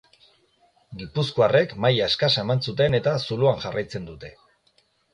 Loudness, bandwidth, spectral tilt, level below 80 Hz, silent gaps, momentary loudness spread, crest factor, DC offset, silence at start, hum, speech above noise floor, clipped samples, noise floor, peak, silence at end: -22 LUFS; 10.5 kHz; -6 dB/octave; -54 dBFS; none; 20 LU; 18 dB; under 0.1%; 0.9 s; none; 42 dB; under 0.1%; -65 dBFS; -6 dBFS; 0.85 s